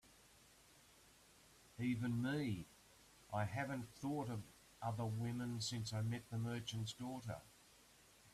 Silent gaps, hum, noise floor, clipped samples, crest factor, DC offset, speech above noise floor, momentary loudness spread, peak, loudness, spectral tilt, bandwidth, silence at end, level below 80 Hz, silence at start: none; none; -68 dBFS; under 0.1%; 18 dB; under 0.1%; 24 dB; 24 LU; -28 dBFS; -45 LUFS; -5.5 dB/octave; 14.5 kHz; 0.05 s; -72 dBFS; 0.05 s